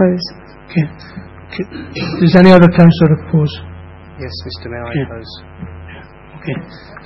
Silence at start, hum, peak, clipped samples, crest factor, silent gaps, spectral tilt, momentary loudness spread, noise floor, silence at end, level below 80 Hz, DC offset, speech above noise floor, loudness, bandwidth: 0 s; none; 0 dBFS; 0.4%; 14 dB; none; -9 dB/octave; 27 LU; -35 dBFS; 0.1 s; -42 dBFS; under 0.1%; 23 dB; -12 LUFS; 6 kHz